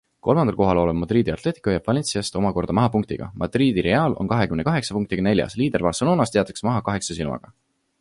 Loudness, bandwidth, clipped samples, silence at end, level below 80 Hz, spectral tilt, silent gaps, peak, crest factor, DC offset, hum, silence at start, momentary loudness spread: -22 LUFS; 11.5 kHz; under 0.1%; 0.6 s; -44 dBFS; -6 dB/octave; none; -4 dBFS; 18 dB; under 0.1%; none; 0.25 s; 7 LU